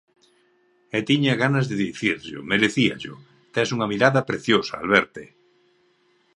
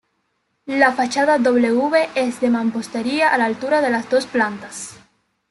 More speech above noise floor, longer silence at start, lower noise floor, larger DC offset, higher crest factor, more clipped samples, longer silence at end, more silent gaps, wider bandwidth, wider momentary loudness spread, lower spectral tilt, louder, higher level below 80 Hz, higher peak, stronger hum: second, 41 dB vs 51 dB; first, 0.95 s vs 0.65 s; second, -63 dBFS vs -69 dBFS; neither; first, 24 dB vs 18 dB; neither; first, 1.1 s vs 0.55 s; neither; about the same, 11 kHz vs 12 kHz; about the same, 11 LU vs 12 LU; first, -5.5 dB/octave vs -4 dB/octave; second, -22 LUFS vs -18 LUFS; about the same, -60 dBFS vs -64 dBFS; about the same, 0 dBFS vs -2 dBFS; neither